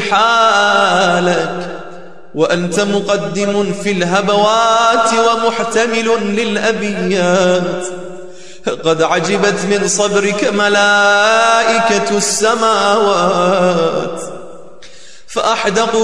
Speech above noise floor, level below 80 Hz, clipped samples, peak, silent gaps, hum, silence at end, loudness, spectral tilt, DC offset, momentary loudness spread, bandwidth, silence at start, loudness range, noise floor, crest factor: 27 dB; -52 dBFS; under 0.1%; 0 dBFS; none; none; 0 s; -13 LUFS; -3.5 dB/octave; 2%; 13 LU; 12 kHz; 0 s; 4 LU; -40 dBFS; 12 dB